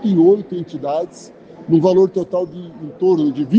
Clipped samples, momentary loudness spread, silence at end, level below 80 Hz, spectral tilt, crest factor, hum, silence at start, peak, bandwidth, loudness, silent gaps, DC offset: under 0.1%; 17 LU; 0 s; -62 dBFS; -9 dB/octave; 16 dB; none; 0 s; -2 dBFS; 8 kHz; -17 LUFS; none; under 0.1%